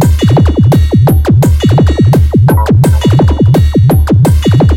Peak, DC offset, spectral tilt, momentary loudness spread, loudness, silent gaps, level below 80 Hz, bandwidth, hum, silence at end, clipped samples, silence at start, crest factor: 0 dBFS; under 0.1%; -7.5 dB/octave; 1 LU; -7 LUFS; none; -14 dBFS; 17 kHz; none; 0 s; under 0.1%; 0 s; 6 dB